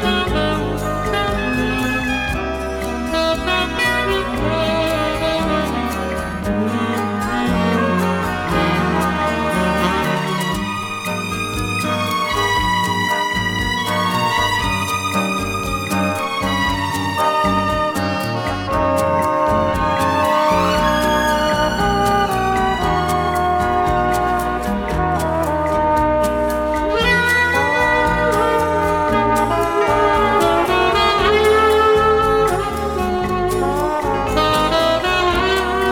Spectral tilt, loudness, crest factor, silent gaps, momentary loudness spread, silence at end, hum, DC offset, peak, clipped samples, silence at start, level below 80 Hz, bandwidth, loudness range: -5 dB/octave; -17 LUFS; 16 dB; none; 6 LU; 0 s; none; under 0.1%; -2 dBFS; under 0.1%; 0 s; -32 dBFS; over 20 kHz; 4 LU